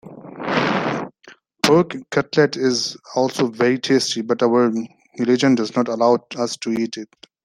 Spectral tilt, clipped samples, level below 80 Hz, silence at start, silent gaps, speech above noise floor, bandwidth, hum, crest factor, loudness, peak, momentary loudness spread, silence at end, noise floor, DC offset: -4.5 dB/octave; under 0.1%; -62 dBFS; 0.05 s; none; 30 dB; 15 kHz; none; 20 dB; -19 LUFS; 0 dBFS; 12 LU; 0.4 s; -49 dBFS; under 0.1%